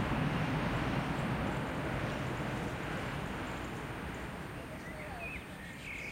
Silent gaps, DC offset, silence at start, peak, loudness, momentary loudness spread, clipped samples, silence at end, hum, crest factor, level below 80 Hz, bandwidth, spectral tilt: none; under 0.1%; 0 s; -22 dBFS; -38 LUFS; 10 LU; under 0.1%; 0 s; none; 14 dB; -48 dBFS; 16 kHz; -6 dB/octave